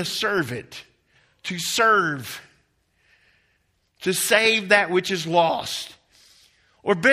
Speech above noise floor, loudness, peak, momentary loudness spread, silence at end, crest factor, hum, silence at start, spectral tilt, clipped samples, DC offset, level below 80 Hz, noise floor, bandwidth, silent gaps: 46 dB; -21 LUFS; -2 dBFS; 18 LU; 0 s; 22 dB; none; 0 s; -3 dB/octave; under 0.1%; under 0.1%; -64 dBFS; -68 dBFS; 15.5 kHz; none